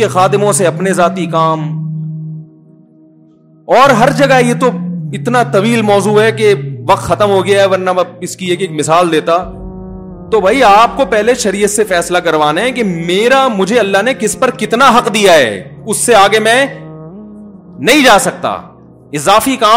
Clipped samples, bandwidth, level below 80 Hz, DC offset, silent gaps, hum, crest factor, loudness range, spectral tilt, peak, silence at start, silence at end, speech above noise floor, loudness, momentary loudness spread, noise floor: 0.6%; 16.5 kHz; -42 dBFS; under 0.1%; none; none; 10 dB; 3 LU; -4 dB/octave; 0 dBFS; 0 s; 0 s; 34 dB; -10 LUFS; 14 LU; -44 dBFS